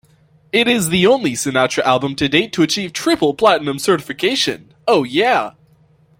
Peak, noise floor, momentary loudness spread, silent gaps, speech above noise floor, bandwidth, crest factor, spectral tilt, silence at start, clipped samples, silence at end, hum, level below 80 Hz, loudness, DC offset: -2 dBFS; -52 dBFS; 5 LU; none; 37 dB; 16.5 kHz; 16 dB; -4 dB/octave; 0.55 s; under 0.1%; 0.7 s; none; -52 dBFS; -16 LUFS; under 0.1%